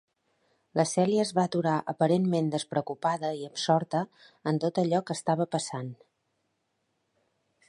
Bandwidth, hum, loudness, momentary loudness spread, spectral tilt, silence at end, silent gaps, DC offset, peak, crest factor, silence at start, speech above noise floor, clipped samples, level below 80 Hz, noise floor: 11.5 kHz; none; -28 LUFS; 8 LU; -5.5 dB/octave; 1.75 s; none; under 0.1%; -10 dBFS; 20 dB; 0.75 s; 49 dB; under 0.1%; -76 dBFS; -77 dBFS